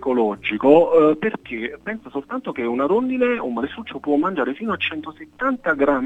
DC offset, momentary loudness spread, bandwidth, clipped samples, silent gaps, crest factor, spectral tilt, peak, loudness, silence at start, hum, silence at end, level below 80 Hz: under 0.1%; 14 LU; 7.8 kHz; under 0.1%; none; 20 dB; -7.5 dB/octave; 0 dBFS; -20 LUFS; 0 s; none; 0 s; -54 dBFS